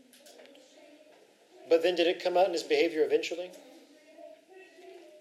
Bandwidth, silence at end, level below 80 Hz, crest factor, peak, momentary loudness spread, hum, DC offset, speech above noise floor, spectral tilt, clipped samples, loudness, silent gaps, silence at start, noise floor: 14 kHz; 0.2 s; under -90 dBFS; 20 dB; -12 dBFS; 25 LU; none; under 0.1%; 32 dB; -3 dB/octave; under 0.1%; -28 LUFS; none; 1.65 s; -60 dBFS